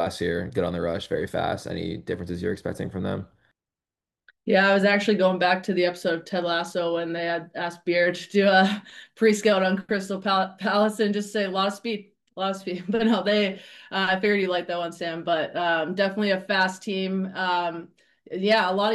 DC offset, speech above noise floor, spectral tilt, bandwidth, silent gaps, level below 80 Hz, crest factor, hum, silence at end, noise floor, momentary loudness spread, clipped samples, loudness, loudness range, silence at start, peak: under 0.1%; over 66 dB; -5 dB/octave; 12.5 kHz; none; -64 dBFS; 18 dB; none; 0 s; under -90 dBFS; 11 LU; under 0.1%; -24 LUFS; 6 LU; 0 s; -6 dBFS